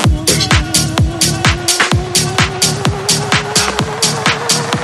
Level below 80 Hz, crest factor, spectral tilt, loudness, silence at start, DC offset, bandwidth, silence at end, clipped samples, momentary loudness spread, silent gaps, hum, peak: -26 dBFS; 14 dB; -3 dB/octave; -12 LUFS; 0 s; under 0.1%; 15.5 kHz; 0 s; under 0.1%; 3 LU; none; none; 0 dBFS